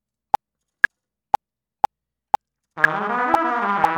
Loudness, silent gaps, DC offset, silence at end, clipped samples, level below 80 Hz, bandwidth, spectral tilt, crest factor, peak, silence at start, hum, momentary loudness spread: -22 LUFS; none; under 0.1%; 0 s; under 0.1%; -58 dBFS; 17.5 kHz; -4.5 dB/octave; 22 dB; 0 dBFS; 2.75 s; none; 6 LU